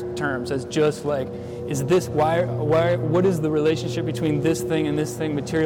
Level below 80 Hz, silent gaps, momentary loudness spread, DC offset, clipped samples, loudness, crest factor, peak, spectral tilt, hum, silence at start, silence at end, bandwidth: -50 dBFS; none; 7 LU; under 0.1%; under 0.1%; -23 LUFS; 10 dB; -12 dBFS; -6.5 dB/octave; none; 0 s; 0 s; 17 kHz